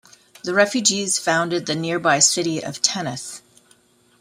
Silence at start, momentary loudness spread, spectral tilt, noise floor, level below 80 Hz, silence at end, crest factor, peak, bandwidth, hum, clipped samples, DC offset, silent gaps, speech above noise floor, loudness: 0.45 s; 16 LU; -2 dB/octave; -57 dBFS; -66 dBFS; 0.8 s; 22 dB; 0 dBFS; 16 kHz; none; under 0.1%; under 0.1%; none; 36 dB; -19 LUFS